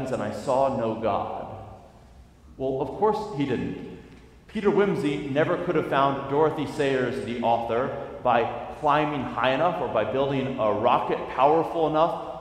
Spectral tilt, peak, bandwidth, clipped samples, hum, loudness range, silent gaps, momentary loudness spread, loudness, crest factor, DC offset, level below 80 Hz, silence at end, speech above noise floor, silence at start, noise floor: -7 dB/octave; -6 dBFS; 13 kHz; under 0.1%; none; 5 LU; none; 8 LU; -25 LUFS; 18 dB; under 0.1%; -52 dBFS; 0 s; 26 dB; 0 s; -50 dBFS